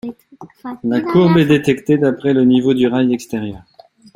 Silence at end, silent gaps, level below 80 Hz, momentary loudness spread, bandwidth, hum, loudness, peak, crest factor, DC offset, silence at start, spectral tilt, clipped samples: 0.55 s; none; -50 dBFS; 16 LU; 15 kHz; none; -15 LUFS; 0 dBFS; 14 dB; under 0.1%; 0.05 s; -7.5 dB/octave; under 0.1%